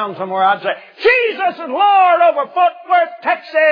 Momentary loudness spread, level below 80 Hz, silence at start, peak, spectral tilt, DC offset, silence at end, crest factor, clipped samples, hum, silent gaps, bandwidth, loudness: 9 LU; -60 dBFS; 0 s; -2 dBFS; -5.5 dB/octave; under 0.1%; 0 s; 14 dB; under 0.1%; none; none; 5.2 kHz; -14 LUFS